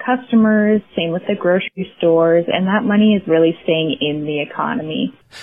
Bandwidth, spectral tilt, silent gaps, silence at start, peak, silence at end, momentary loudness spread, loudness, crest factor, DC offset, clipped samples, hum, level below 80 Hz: 4.9 kHz; -8 dB/octave; none; 0 s; -2 dBFS; 0 s; 8 LU; -16 LUFS; 14 dB; 0.1%; under 0.1%; none; -56 dBFS